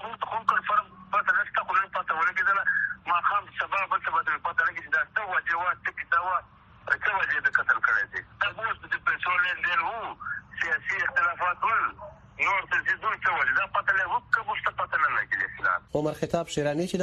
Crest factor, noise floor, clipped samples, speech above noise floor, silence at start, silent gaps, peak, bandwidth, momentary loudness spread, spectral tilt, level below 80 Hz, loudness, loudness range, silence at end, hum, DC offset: 20 dB; -47 dBFS; under 0.1%; 19 dB; 0 s; none; -8 dBFS; 12 kHz; 6 LU; -4 dB/octave; -60 dBFS; -26 LUFS; 2 LU; 0 s; none; under 0.1%